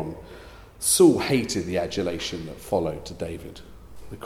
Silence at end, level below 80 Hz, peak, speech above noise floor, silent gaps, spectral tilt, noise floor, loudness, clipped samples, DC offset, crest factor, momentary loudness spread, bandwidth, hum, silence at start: 0 s; -48 dBFS; -6 dBFS; 21 dB; none; -4 dB/octave; -44 dBFS; -23 LUFS; under 0.1%; under 0.1%; 20 dB; 25 LU; 16 kHz; none; 0 s